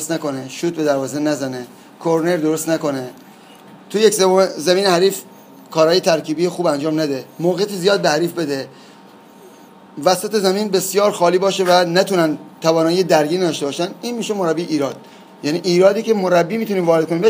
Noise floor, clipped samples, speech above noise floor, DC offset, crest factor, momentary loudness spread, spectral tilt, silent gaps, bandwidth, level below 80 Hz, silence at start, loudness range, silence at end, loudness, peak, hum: -43 dBFS; under 0.1%; 26 dB; under 0.1%; 18 dB; 11 LU; -4.5 dB/octave; none; 15.5 kHz; -74 dBFS; 0 s; 4 LU; 0 s; -17 LUFS; 0 dBFS; none